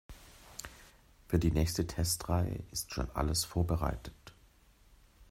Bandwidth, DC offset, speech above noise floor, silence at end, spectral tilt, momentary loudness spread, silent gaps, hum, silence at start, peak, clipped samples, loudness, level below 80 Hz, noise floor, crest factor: 16 kHz; under 0.1%; 30 dB; 0.05 s; -5 dB/octave; 18 LU; none; none; 0.1 s; -14 dBFS; under 0.1%; -34 LUFS; -44 dBFS; -63 dBFS; 20 dB